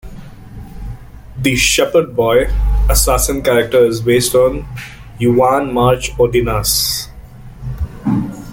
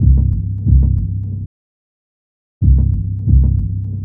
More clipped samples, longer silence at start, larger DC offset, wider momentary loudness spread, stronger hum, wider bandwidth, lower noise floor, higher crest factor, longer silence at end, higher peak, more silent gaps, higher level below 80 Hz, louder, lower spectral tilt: neither; about the same, 0.05 s vs 0 s; neither; first, 20 LU vs 10 LU; neither; first, 17 kHz vs 1 kHz; second, -34 dBFS vs under -90 dBFS; about the same, 14 dB vs 14 dB; about the same, 0 s vs 0 s; about the same, 0 dBFS vs 0 dBFS; second, none vs 1.46-2.61 s; second, -24 dBFS vs -16 dBFS; about the same, -14 LUFS vs -16 LUFS; second, -4 dB/octave vs -17 dB/octave